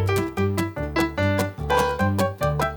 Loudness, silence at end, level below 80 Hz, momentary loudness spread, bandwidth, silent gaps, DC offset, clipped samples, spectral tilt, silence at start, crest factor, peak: -23 LUFS; 0 s; -38 dBFS; 3 LU; 19.5 kHz; none; under 0.1%; under 0.1%; -6 dB/octave; 0 s; 16 dB; -6 dBFS